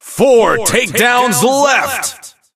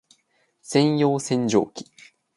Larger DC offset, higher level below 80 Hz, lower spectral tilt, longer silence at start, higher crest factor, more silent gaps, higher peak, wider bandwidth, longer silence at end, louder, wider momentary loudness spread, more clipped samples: neither; first, -46 dBFS vs -68 dBFS; second, -2.5 dB/octave vs -5.5 dB/octave; second, 0.05 s vs 0.7 s; second, 12 dB vs 20 dB; neither; first, 0 dBFS vs -4 dBFS; first, 16.5 kHz vs 11.5 kHz; second, 0.25 s vs 0.55 s; first, -11 LUFS vs -22 LUFS; second, 8 LU vs 11 LU; neither